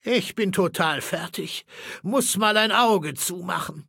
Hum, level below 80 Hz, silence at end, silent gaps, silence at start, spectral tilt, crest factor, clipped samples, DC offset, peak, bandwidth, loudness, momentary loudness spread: none; -66 dBFS; 0.05 s; none; 0.05 s; -3 dB/octave; 20 dB; under 0.1%; under 0.1%; -4 dBFS; 17 kHz; -23 LUFS; 14 LU